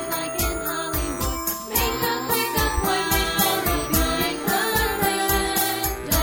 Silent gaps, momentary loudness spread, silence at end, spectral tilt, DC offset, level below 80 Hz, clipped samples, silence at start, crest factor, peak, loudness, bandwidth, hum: none; 5 LU; 0 s; -3 dB/octave; under 0.1%; -32 dBFS; under 0.1%; 0 s; 16 dB; -6 dBFS; -22 LUFS; over 20 kHz; none